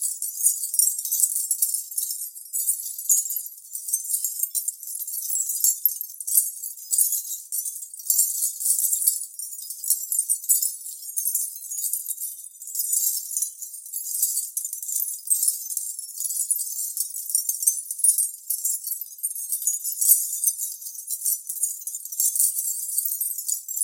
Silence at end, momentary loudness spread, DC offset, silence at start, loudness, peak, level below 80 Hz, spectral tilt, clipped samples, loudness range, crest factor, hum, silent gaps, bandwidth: 0 s; 10 LU; under 0.1%; 0 s; -23 LUFS; -2 dBFS; under -90 dBFS; 12.5 dB/octave; under 0.1%; 3 LU; 24 dB; none; none; 17 kHz